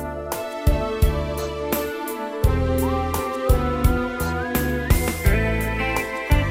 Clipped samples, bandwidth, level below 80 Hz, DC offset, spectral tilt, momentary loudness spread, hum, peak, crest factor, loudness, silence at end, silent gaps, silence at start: under 0.1%; 16.5 kHz; -26 dBFS; under 0.1%; -6 dB/octave; 6 LU; none; -4 dBFS; 16 dB; -23 LUFS; 0 s; none; 0 s